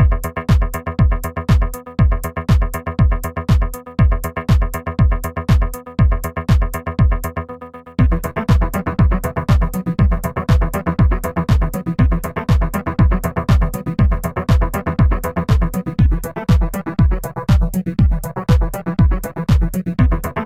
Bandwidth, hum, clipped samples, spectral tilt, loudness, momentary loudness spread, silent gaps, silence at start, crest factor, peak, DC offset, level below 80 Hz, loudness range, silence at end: 16 kHz; none; under 0.1%; -7.5 dB/octave; -18 LUFS; 5 LU; none; 0 s; 14 dB; -2 dBFS; 0.5%; -20 dBFS; 1 LU; 0 s